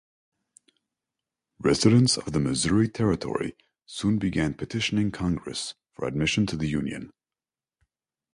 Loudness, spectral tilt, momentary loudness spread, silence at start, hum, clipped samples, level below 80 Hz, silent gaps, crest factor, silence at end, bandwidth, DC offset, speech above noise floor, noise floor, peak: -25 LUFS; -5 dB/octave; 13 LU; 1.6 s; none; under 0.1%; -48 dBFS; none; 22 dB; 1.25 s; 11.5 kHz; under 0.1%; over 65 dB; under -90 dBFS; -6 dBFS